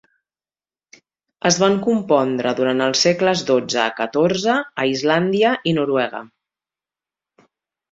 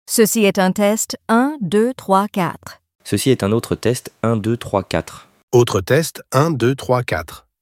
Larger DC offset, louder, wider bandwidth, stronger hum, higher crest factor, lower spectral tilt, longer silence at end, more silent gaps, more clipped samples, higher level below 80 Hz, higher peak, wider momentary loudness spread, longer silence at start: neither; about the same, -18 LUFS vs -18 LUFS; second, 7.8 kHz vs 16.5 kHz; neither; about the same, 18 dB vs 18 dB; about the same, -4 dB/octave vs -5 dB/octave; first, 1.65 s vs 0.25 s; second, none vs 2.95-2.99 s, 5.43-5.48 s; neither; second, -62 dBFS vs -50 dBFS; about the same, -2 dBFS vs 0 dBFS; second, 5 LU vs 8 LU; first, 1.45 s vs 0.1 s